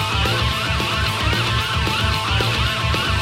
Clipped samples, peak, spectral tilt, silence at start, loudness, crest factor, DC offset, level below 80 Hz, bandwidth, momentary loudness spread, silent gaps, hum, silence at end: under 0.1%; -6 dBFS; -4 dB/octave; 0 s; -19 LUFS; 14 dB; under 0.1%; -28 dBFS; 16.5 kHz; 1 LU; none; none; 0 s